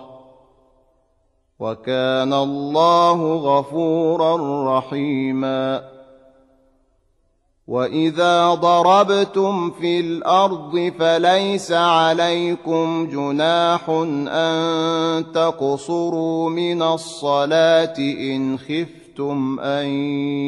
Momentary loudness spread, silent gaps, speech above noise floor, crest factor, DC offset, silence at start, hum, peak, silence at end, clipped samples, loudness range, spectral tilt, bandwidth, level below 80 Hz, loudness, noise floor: 8 LU; none; 45 dB; 16 dB; under 0.1%; 0 s; none; -2 dBFS; 0 s; under 0.1%; 5 LU; -5.5 dB/octave; 11.5 kHz; -64 dBFS; -19 LUFS; -63 dBFS